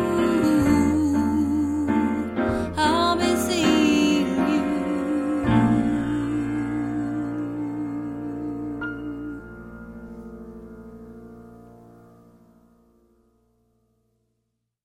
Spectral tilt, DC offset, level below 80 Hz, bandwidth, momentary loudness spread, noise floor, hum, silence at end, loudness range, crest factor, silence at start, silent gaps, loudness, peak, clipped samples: -5.5 dB/octave; under 0.1%; -46 dBFS; 16 kHz; 21 LU; -77 dBFS; none; 3 s; 19 LU; 18 dB; 0 s; none; -23 LUFS; -8 dBFS; under 0.1%